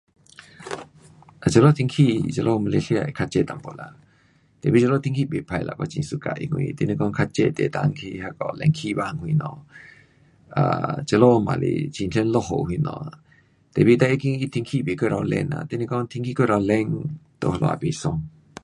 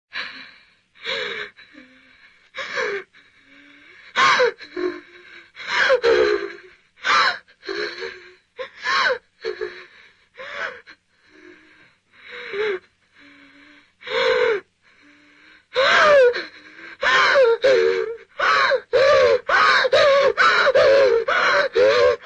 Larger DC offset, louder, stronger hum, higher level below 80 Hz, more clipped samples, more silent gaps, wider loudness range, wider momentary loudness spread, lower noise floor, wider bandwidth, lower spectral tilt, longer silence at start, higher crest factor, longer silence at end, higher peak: neither; second, -22 LUFS vs -18 LUFS; neither; first, -50 dBFS vs -58 dBFS; neither; neither; second, 4 LU vs 16 LU; second, 14 LU vs 19 LU; first, -59 dBFS vs -55 dBFS; first, 11 kHz vs 8.6 kHz; first, -7 dB/octave vs -2 dB/octave; first, 0.6 s vs 0.15 s; first, 22 dB vs 16 dB; first, 0.35 s vs 0.1 s; first, -2 dBFS vs -6 dBFS